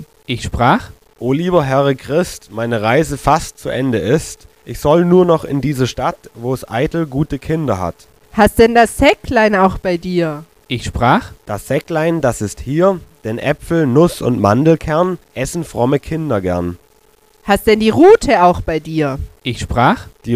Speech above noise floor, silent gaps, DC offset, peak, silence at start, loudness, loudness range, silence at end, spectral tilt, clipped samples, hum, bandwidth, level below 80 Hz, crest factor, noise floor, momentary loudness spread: 37 dB; none; 0.2%; 0 dBFS; 0 s; -15 LUFS; 4 LU; 0 s; -6 dB/octave; under 0.1%; none; 15.5 kHz; -34 dBFS; 14 dB; -52 dBFS; 13 LU